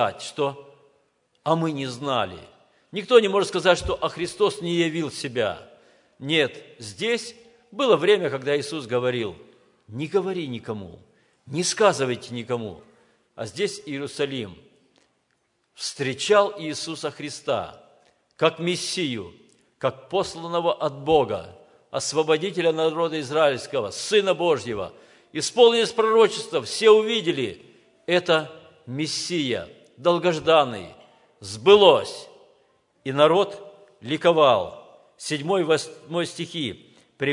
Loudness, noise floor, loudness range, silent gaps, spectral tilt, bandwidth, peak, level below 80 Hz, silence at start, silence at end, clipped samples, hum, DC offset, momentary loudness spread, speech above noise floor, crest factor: -23 LUFS; -70 dBFS; 7 LU; none; -4 dB/octave; 11 kHz; 0 dBFS; -58 dBFS; 0 s; 0 s; under 0.1%; none; under 0.1%; 17 LU; 48 dB; 24 dB